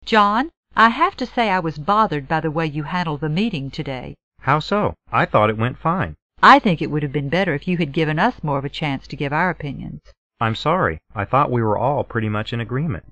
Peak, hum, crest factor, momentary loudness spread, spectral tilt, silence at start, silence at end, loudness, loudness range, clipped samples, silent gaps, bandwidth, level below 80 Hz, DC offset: 0 dBFS; none; 20 dB; 11 LU; -7 dB/octave; 0.05 s; 0.1 s; -19 LUFS; 5 LU; under 0.1%; 0.57-0.63 s, 4.23-4.31 s, 6.22-6.30 s, 10.17-10.30 s; 8.6 kHz; -46 dBFS; 0.4%